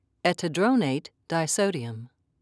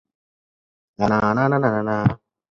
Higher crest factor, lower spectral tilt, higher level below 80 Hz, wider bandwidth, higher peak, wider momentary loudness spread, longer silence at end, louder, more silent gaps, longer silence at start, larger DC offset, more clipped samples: about the same, 18 dB vs 20 dB; second, -4.5 dB/octave vs -8.5 dB/octave; second, -74 dBFS vs -48 dBFS; first, 11 kHz vs 7.2 kHz; second, -10 dBFS vs -2 dBFS; first, 12 LU vs 5 LU; about the same, 0.35 s vs 0.35 s; second, -26 LUFS vs -20 LUFS; neither; second, 0.25 s vs 1 s; neither; neither